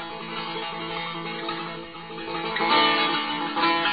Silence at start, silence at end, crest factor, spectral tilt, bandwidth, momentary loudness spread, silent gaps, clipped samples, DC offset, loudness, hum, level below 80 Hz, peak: 0 s; 0 s; 18 dB; -8 dB/octave; 5 kHz; 14 LU; none; under 0.1%; 0.2%; -25 LUFS; none; -62 dBFS; -8 dBFS